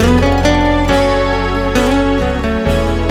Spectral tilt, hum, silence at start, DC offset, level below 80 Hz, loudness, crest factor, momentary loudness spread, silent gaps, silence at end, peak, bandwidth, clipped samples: -6 dB/octave; none; 0 s; under 0.1%; -20 dBFS; -13 LUFS; 12 dB; 4 LU; none; 0 s; 0 dBFS; 15.5 kHz; under 0.1%